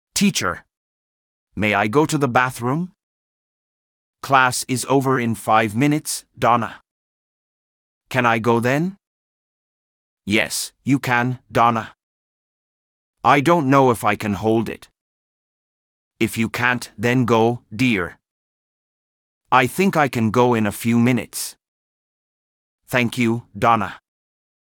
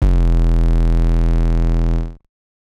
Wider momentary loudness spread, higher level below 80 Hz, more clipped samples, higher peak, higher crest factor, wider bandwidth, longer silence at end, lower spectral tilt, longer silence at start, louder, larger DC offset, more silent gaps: first, 10 LU vs 5 LU; second, -58 dBFS vs -14 dBFS; neither; first, 0 dBFS vs -6 dBFS; first, 20 dB vs 10 dB; first, over 20 kHz vs 4.5 kHz; first, 0.8 s vs 0.55 s; second, -5 dB/octave vs -8.5 dB/octave; first, 0.15 s vs 0 s; about the same, -19 LUFS vs -18 LUFS; neither; first, 0.77-1.47 s, 3.03-4.13 s, 6.91-8.01 s, 9.07-10.17 s, 12.03-13.13 s, 15.01-16.11 s, 18.31-19.41 s, 21.68-22.78 s vs none